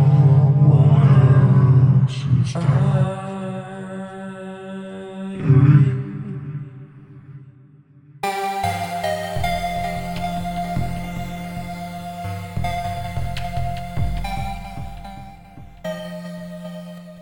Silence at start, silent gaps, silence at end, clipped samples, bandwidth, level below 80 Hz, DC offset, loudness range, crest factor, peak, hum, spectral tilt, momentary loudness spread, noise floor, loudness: 0 s; none; 0 s; under 0.1%; 17 kHz; -40 dBFS; under 0.1%; 13 LU; 18 dB; -2 dBFS; none; -8 dB/octave; 20 LU; -48 dBFS; -19 LUFS